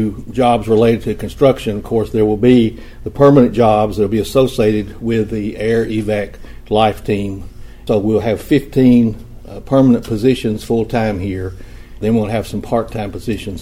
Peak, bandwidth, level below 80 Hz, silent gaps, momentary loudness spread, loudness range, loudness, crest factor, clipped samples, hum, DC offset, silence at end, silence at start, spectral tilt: 0 dBFS; 16 kHz; -34 dBFS; none; 12 LU; 5 LU; -15 LUFS; 14 dB; under 0.1%; none; under 0.1%; 0 s; 0 s; -7.5 dB/octave